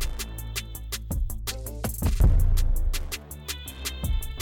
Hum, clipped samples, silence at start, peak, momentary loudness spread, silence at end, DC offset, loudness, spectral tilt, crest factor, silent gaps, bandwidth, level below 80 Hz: none; under 0.1%; 0 s; -10 dBFS; 12 LU; 0 s; under 0.1%; -30 LUFS; -4.5 dB/octave; 14 dB; none; 18 kHz; -26 dBFS